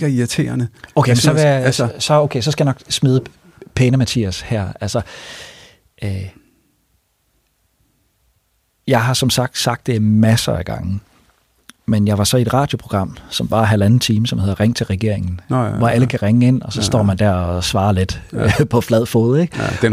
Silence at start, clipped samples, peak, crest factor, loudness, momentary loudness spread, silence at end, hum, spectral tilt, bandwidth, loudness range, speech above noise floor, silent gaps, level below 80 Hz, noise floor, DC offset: 0 s; under 0.1%; -2 dBFS; 16 dB; -16 LUFS; 10 LU; 0 s; none; -5.5 dB/octave; 15.5 kHz; 10 LU; 48 dB; none; -40 dBFS; -63 dBFS; under 0.1%